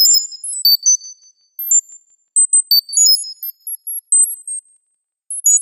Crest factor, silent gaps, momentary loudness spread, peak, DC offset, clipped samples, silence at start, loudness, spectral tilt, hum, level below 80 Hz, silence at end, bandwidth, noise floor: 14 dB; none; 16 LU; -2 dBFS; under 0.1%; under 0.1%; 0 s; -12 LUFS; 8.5 dB/octave; none; -86 dBFS; 0 s; 16.5 kHz; -71 dBFS